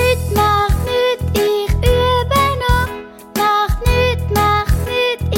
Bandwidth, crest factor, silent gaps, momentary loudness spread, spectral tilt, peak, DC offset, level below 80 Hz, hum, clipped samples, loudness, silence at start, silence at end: 17 kHz; 14 dB; none; 4 LU; -5 dB/octave; -2 dBFS; under 0.1%; -22 dBFS; none; under 0.1%; -16 LUFS; 0 s; 0 s